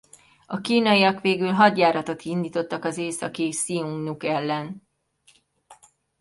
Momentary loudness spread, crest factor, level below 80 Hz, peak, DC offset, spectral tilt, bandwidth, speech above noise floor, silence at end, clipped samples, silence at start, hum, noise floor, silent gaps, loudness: 12 LU; 20 dB; -68 dBFS; -4 dBFS; under 0.1%; -4.5 dB/octave; 11.5 kHz; 38 dB; 0.45 s; under 0.1%; 0.5 s; none; -61 dBFS; none; -23 LUFS